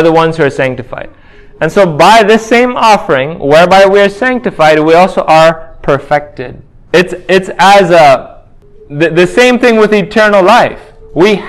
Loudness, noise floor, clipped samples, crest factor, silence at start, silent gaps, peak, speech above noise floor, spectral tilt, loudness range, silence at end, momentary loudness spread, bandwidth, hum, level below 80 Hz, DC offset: -7 LUFS; -36 dBFS; 5%; 8 dB; 0 s; none; 0 dBFS; 29 dB; -5 dB/octave; 3 LU; 0 s; 10 LU; 16 kHz; none; -38 dBFS; under 0.1%